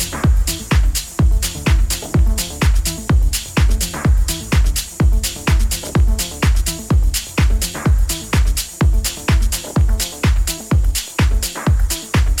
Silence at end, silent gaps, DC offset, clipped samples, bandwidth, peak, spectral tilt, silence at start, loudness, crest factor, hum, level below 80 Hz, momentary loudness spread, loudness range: 0 s; none; 0.2%; under 0.1%; 17.5 kHz; -2 dBFS; -4.5 dB/octave; 0 s; -18 LUFS; 12 dB; none; -16 dBFS; 2 LU; 1 LU